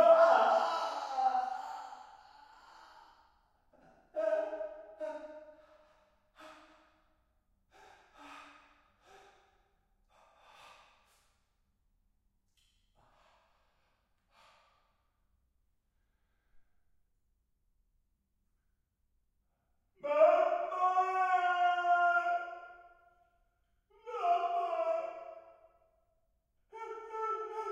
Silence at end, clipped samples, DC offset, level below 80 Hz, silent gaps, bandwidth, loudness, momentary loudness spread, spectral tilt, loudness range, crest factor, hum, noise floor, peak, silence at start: 0 s; under 0.1%; under 0.1%; -78 dBFS; none; 8 kHz; -32 LUFS; 24 LU; -2.5 dB/octave; 12 LU; 24 dB; none; -79 dBFS; -14 dBFS; 0 s